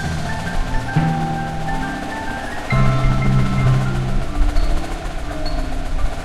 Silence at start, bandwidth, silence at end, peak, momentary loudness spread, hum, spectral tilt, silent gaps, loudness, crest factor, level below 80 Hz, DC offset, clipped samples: 0 s; 12.5 kHz; 0 s; -4 dBFS; 9 LU; none; -6.5 dB/octave; none; -21 LUFS; 14 dB; -22 dBFS; under 0.1%; under 0.1%